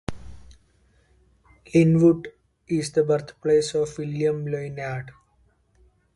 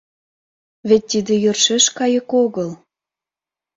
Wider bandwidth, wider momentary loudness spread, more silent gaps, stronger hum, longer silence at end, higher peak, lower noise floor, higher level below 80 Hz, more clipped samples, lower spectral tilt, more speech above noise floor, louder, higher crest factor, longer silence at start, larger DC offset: first, 11.5 kHz vs 7.8 kHz; first, 15 LU vs 12 LU; neither; second, none vs 50 Hz at -45 dBFS; about the same, 1.05 s vs 1 s; second, -6 dBFS vs -2 dBFS; second, -63 dBFS vs -89 dBFS; first, -52 dBFS vs -62 dBFS; neither; first, -7 dB/octave vs -3 dB/octave; second, 41 dB vs 72 dB; second, -23 LUFS vs -16 LUFS; about the same, 18 dB vs 18 dB; second, 0.1 s vs 0.85 s; neither